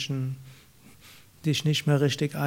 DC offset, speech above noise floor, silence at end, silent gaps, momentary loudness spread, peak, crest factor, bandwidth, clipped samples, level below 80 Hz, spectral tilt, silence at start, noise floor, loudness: under 0.1%; 28 dB; 0 s; none; 11 LU; -10 dBFS; 18 dB; 16.5 kHz; under 0.1%; -64 dBFS; -5.5 dB/octave; 0 s; -54 dBFS; -26 LUFS